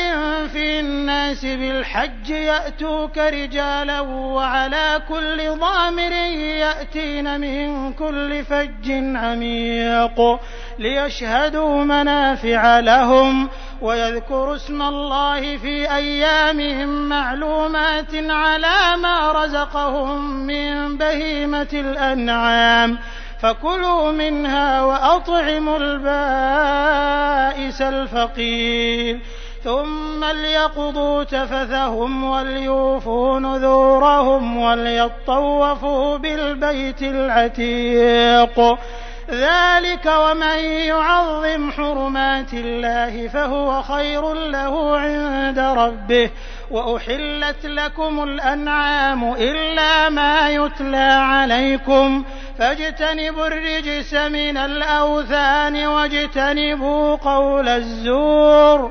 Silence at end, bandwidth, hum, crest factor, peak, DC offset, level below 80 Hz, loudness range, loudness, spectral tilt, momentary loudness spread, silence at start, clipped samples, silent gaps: 0 s; 6.6 kHz; none; 18 dB; 0 dBFS; 0.3%; -30 dBFS; 5 LU; -18 LUFS; -4 dB/octave; 9 LU; 0 s; under 0.1%; none